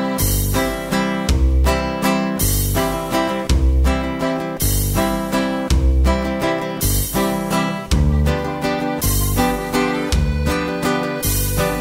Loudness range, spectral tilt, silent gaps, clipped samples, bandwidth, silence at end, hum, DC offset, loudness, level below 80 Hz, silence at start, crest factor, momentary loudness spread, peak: 1 LU; -5 dB/octave; none; under 0.1%; 16.5 kHz; 0 s; none; under 0.1%; -19 LUFS; -22 dBFS; 0 s; 14 dB; 3 LU; -4 dBFS